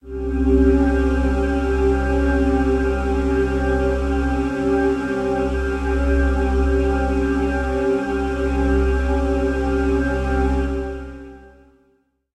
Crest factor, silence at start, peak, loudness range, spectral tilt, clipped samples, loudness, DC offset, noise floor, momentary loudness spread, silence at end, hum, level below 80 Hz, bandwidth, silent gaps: 14 dB; 0.05 s; -4 dBFS; 2 LU; -8 dB/octave; under 0.1%; -20 LUFS; under 0.1%; -62 dBFS; 4 LU; 0.9 s; none; -24 dBFS; 8.8 kHz; none